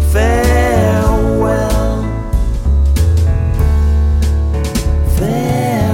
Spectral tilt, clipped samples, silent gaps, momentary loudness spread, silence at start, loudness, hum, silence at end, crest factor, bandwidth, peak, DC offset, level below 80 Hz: -7 dB/octave; under 0.1%; none; 5 LU; 0 s; -14 LUFS; none; 0 s; 12 dB; 16 kHz; 0 dBFS; under 0.1%; -14 dBFS